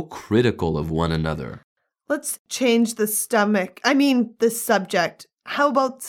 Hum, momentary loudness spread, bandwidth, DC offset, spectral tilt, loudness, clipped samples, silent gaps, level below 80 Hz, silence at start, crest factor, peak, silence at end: none; 8 LU; 17.5 kHz; under 0.1%; -4.5 dB/octave; -21 LUFS; under 0.1%; 1.64-1.76 s, 2.39-2.45 s; -46 dBFS; 0 s; 18 dB; -2 dBFS; 0 s